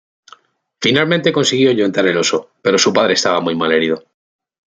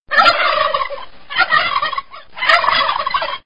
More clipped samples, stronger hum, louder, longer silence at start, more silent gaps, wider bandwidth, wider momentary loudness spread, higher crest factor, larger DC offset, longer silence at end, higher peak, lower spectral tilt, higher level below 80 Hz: neither; neither; about the same, -15 LUFS vs -15 LUFS; first, 0.8 s vs 0 s; second, none vs 0.00-0.06 s; second, 9.6 kHz vs 11 kHz; second, 6 LU vs 13 LU; about the same, 16 dB vs 16 dB; second, under 0.1% vs 2%; first, 0.65 s vs 0 s; about the same, 0 dBFS vs 0 dBFS; first, -3.5 dB/octave vs -2 dB/octave; second, -60 dBFS vs -48 dBFS